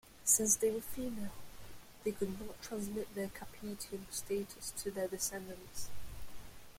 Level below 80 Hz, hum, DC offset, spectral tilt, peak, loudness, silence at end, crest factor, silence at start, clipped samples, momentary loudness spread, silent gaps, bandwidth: -58 dBFS; none; under 0.1%; -3 dB/octave; -16 dBFS; -37 LUFS; 0 s; 24 dB; 0.05 s; under 0.1%; 23 LU; none; 16.5 kHz